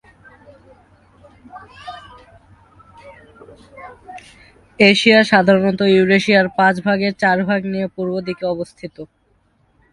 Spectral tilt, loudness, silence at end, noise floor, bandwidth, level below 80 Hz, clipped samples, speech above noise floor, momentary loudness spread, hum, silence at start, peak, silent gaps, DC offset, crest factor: -5.5 dB/octave; -15 LUFS; 0.9 s; -60 dBFS; 11 kHz; -56 dBFS; under 0.1%; 43 dB; 26 LU; none; 1.55 s; 0 dBFS; none; under 0.1%; 18 dB